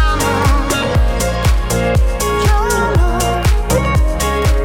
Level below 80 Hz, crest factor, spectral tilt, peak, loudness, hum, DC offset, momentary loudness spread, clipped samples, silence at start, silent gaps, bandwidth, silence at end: -16 dBFS; 12 dB; -5 dB/octave; -2 dBFS; -15 LUFS; none; under 0.1%; 2 LU; under 0.1%; 0 s; none; 17.5 kHz; 0 s